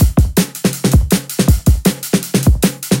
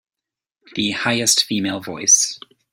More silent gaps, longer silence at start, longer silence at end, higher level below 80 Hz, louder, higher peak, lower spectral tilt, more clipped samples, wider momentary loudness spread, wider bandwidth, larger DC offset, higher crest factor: neither; second, 0 s vs 0.75 s; second, 0 s vs 0.35 s; first, -18 dBFS vs -62 dBFS; first, -14 LUFS vs -17 LUFS; about the same, 0 dBFS vs -2 dBFS; first, -5.5 dB/octave vs -1 dB/octave; neither; second, 4 LU vs 12 LU; about the same, 17.5 kHz vs 16.5 kHz; neither; second, 12 dB vs 18 dB